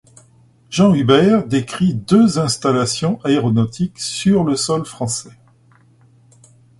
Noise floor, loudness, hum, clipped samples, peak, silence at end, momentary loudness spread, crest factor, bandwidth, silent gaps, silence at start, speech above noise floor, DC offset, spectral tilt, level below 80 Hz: -51 dBFS; -16 LUFS; none; under 0.1%; 0 dBFS; 1.5 s; 10 LU; 16 dB; 11.5 kHz; none; 0.7 s; 36 dB; under 0.1%; -5.5 dB/octave; -50 dBFS